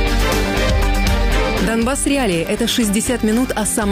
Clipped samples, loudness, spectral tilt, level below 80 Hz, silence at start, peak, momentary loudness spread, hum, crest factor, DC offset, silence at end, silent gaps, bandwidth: under 0.1%; -17 LUFS; -4 dB/octave; -22 dBFS; 0 s; -8 dBFS; 1 LU; none; 10 dB; under 0.1%; 0 s; none; 16 kHz